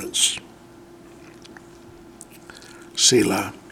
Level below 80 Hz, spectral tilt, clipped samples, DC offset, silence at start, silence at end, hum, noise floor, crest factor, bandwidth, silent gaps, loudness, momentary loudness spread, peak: -58 dBFS; -2 dB/octave; under 0.1%; under 0.1%; 0 s; 0.15 s; none; -46 dBFS; 22 dB; 17 kHz; none; -19 LUFS; 27 LU; -4 dBFS